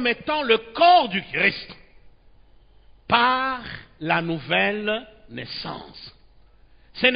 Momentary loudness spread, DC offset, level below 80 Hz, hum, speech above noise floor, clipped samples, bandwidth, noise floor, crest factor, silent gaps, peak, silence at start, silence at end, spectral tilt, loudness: 21 LU; under 0.1%; -54 dBFS; none; 30 dB; under 0.1%; 5.2 kHz; -52 dBFS; 20 dB; none; -4 dBFS; 0 s; 0 s; -9 dB/octave; -21 LUFS